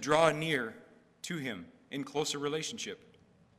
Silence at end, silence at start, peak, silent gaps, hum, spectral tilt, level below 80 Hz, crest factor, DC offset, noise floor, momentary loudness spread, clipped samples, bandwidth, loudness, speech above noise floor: 0.6 s; 0 s; -10 dBFS; none; none; -3.5 dB/octave; -70 dBFS; 24 dB; under 0.1%; -63 dBFS; 17 LU; under 0.1%; 15.5 kHz; -34 LUFS; 30 dB